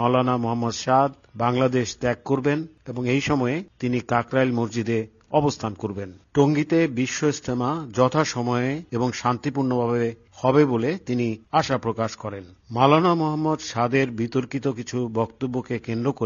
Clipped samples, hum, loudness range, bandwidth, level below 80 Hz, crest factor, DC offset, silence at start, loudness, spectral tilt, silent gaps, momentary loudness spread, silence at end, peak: under 0.1%; none; 2 LU; 7.4 kHz; -56 dBFS; 20 dB; under 0.1%; 0 s; -23 LUFS; -5.5 dB/octave; none; 8 LU; 0 s; -2 dBFS